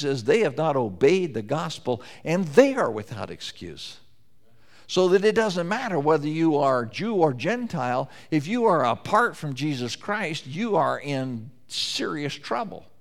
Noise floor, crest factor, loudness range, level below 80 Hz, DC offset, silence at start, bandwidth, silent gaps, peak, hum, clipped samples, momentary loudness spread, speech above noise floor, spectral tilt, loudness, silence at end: -62 dBFS; 22 dB; 3 LU; -66 dBFS; 0.4%; 0 s; 14.5 kHz; none; -2 dBFS; none; under 0.1%; 12 LU; 38 dB; -5.5 dB/octave; -24 LUFS; 0.2 s